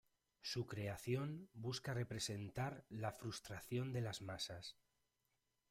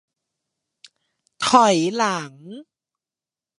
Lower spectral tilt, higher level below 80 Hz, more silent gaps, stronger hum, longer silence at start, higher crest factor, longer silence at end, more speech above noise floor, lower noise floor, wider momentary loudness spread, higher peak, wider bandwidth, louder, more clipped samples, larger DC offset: first, -5 dB/octave vs -3.5 dB/octave; about the same, -72 dBFS vs -70 dBFS; neither; neither; second, 0.45 s vs 1.4 s; about the same, 18 dB vs 22 dB; about the same, 1 s vs 1 s; second, 41 dB vs over 71 dB; about the same, -87 dBFS vs under -90 dBFS; second, 6 LU vs 24 LU; second, -30 dBFS vs -2 dBFS; first, 16 kHz vs 11.5 kHz; second, -47 LUFS vs -18 LUFS; neither; neither